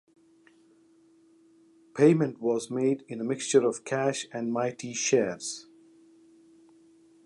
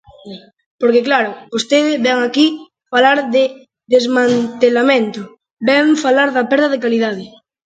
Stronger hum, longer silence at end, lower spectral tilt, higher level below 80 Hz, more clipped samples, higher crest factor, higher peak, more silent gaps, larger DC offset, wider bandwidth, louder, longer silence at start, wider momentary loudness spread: neither; first, 1.65 s vs 0.4 s; about the same, -5 dB/octave vs -4 dB/octave; second, -78 dBFS vs -64 dBFS; neither; first, 20 dB vs 14 dB; second, -8 dBFS vs 0 dBFS; second, none vs 0.66-0.79 s, 5.51-5.57 s; neither; first, 11.5 kHz vs 9 kHz; second, -27 LUFS vs -14 LUFS; first, 1.95 s vs 0.25 s; about the same, 11 LU vs 12 LU